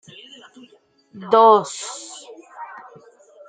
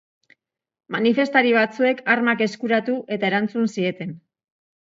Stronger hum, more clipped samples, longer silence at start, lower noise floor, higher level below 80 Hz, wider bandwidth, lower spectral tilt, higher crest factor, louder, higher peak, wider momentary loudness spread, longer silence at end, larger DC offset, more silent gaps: neither; neither; first, 1.15 s vs 0.9 s; second, -54 dBFS vs -60 dBFS; about the same, -74 dBFS vs -72 dBFS; first, 9.4 kHz vs 7.6 kHz; second, -3.5 dB/octave vs -6 dB/octave; about the same, 20 dB vs 20 dB; first, -16 LUFS vs -20 LUFS; about the same, -2 dBFS vs -2 dBFS; first, 28 LU vs 9 LU; first, 0.85 s vs 0.7 s; neither; neither